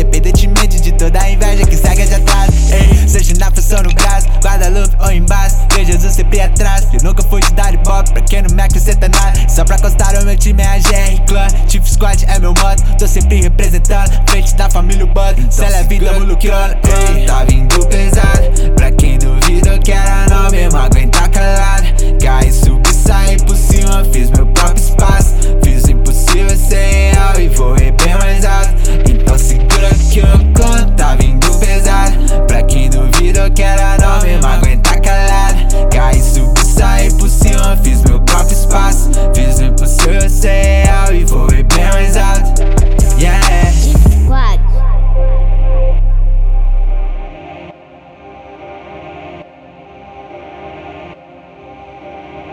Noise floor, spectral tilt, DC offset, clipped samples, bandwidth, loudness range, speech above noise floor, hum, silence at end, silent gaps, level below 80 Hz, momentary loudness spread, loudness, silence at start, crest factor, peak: -37 dBFS; -4.5 dB/octave; under 0.1%; under 0.1%; 15.5 kHz; 4 LU; 31 dB; none; 0 s; none; -8 dBFS; 4 LU; -12 LUFS; 0 s; 6 dB; 0 dBFS